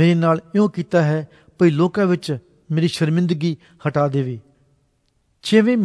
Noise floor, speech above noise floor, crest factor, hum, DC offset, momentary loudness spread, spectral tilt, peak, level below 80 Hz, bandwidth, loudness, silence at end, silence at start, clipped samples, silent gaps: -65 dBFS; 47 dB; 16 dB; none; under 0.1%; 12 LU; -7.5 dB/octave; -2 dBFS; -62 dBFS; 11 kHz; -19 LUFS; 0 s; 0 s; under 0.1%; none